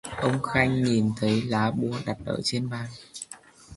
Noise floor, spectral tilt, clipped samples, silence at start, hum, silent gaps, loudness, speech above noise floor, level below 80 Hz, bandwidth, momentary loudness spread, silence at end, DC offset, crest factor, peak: -47 dBFS; -5.5 dB/octave; under 0.1%; 0.05 s; none; none; -26 LUFS; 22 dB; -52 dBFS; 11.5 kHz; 16 LU; 0 s; under 0.1%; 22 dB; -4 dBFS